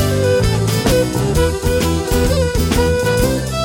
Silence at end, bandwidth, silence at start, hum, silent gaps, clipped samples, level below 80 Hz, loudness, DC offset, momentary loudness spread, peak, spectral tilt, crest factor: 0 s; 17 kHz; 0 s; none; none; under 0.1%; -24 dBFS; -16 LUFS; under 0.1%; 2 LU; -2 dBFS; -5.5 dB/octave; 12 dB